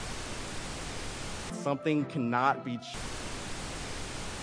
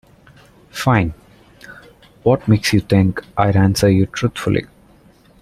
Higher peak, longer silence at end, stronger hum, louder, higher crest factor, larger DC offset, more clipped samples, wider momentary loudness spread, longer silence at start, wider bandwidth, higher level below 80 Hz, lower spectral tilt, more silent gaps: second, -12 dBFS vs -2 dBFS; second, 0 s vs 0.75 s; neither; second, -34 LUFS vs -17 LUFS; first, 22 dB vs 16 dB; neither; neither; first, 10 LU vs 7 LU; second, 0 s vs 0.75 s; second, 10.5 kHz vs 15 kHz; about the same, -46 dBFS vs -42 dBFS; second, -4.5 dB/octave vs -6.5 dB/octave; neither